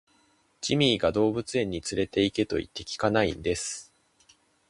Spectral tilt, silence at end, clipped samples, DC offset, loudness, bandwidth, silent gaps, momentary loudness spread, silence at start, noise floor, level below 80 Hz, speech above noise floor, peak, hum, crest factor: -4.5 dB/octave; 0.85 s; under 0.1%; under 0.1%; -27 LUFS; 11.5 kHz; none; 10 LU; 0.6 s; -66 dBFS; -52 dBFS; 39 dB; -6 dBFS; none; 22 dB